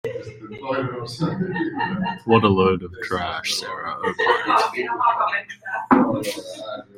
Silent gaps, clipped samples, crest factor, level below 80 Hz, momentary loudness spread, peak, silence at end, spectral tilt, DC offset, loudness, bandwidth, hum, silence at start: none; under 0.1%; 20 dB; -56 dBFS; 13 LU; -2 dBFS; 0.15 s; -5 dB/octave; under 0.1%; -22 LUFS; 16 kHz; none; 0.05 s